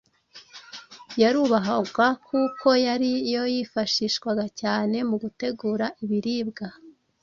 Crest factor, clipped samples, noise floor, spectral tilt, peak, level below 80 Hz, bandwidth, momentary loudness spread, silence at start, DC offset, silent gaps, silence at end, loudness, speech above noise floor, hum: 18 dB; under 0.1%; -52 dBFS; -4.5 dB/octave; -6 dBFS; -66 dBFS; 7.4 kHz; 17 LU; 0.35 s; under 0.1%; none; 0.3 s; -24 LUFS; 28 dB; none